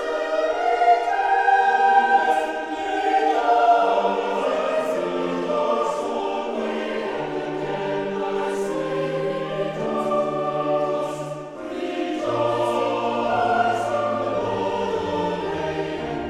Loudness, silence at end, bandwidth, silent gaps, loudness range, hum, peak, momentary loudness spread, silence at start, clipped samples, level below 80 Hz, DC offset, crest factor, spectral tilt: -22 LUFS; 0 s; 13 kHz; none; 6 LU; none; -4 dBFS; 9 LU; 0 s; under 0.1%; -56 dBFS; under 0.1%; 18 dB; -5 dB/octave